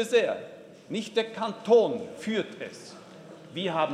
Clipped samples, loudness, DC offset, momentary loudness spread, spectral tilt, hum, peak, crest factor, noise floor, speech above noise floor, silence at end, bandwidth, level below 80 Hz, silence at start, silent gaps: under 0.1%; -28 LUFS; under 0.1%; 24 LU; -4.5 dB/octave; none; -10 dBFS; 20 dB; -47 dBFS; 20 dB; 0 s; 12.5 kHz; -78 dBFS; 0 s; none